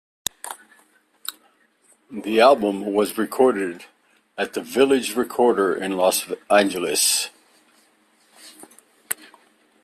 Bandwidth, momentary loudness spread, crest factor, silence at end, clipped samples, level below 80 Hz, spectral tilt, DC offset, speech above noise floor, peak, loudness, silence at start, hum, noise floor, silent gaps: 16 kHz; 18 LU; 22 dB; 0.7 s; under 0.1%; -66 dBFS; -2.5 dB/octave; under 0.1%; 41 dB; -2 dBFS; -20 LUFS; 0.45 s; none; -60 dBFS; none